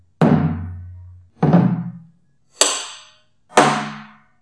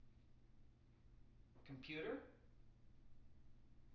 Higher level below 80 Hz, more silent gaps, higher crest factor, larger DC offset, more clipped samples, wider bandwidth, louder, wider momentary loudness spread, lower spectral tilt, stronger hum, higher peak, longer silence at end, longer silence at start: first, -52 dBFS vs -70 dBFS; neither; about the same, 20 dB vs 20 dB; first, 0.1% vs under 0.1%; neither; first, 11 kHz vs 6.2 kHz; first, -18 LUFS vs -52 LUFS; first, 21 LU vs 18 LU; about the same, -4.5 dB/octave vs -4 dB/octave; neither; first, 0 dBFS vs -36 dBFS; first, 0.35 s vs 0 s; first, 0.2 s vs 0 s